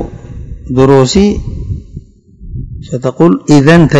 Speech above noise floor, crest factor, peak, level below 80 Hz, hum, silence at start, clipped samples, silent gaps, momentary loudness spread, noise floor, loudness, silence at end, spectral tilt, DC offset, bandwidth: 26 dB; 10 dB; 0 dBFS; -26 dBFS; none; 0 s; 4%; none; 21 LU; -33 dBFS; -9 LUFS; 0 s; -6.5 dB/octave; under 0.1%; 11 kHz